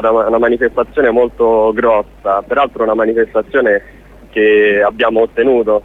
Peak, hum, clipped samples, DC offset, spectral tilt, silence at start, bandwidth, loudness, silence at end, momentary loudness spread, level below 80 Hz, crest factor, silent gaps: -2 dBFS; none; under 0.1%; under 0.1%; -7 dB/octave; 0 s; 4 kHz; -13 LUFS; 0.05 s; 5 LU; -40 dBFS; 12 dB; none